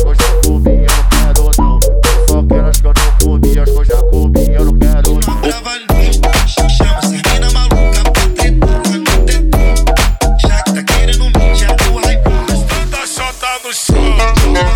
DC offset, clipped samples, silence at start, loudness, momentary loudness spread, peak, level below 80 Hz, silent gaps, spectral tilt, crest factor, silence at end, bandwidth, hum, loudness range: under 0.1%; under 0.1%; 0 s; -12 LUFS; 4 LU; 0 dBFS; -10 dBFS; none; -4.5 dB/octave; 8 dB; 0 s; 17.5 kHz; none; 2 LU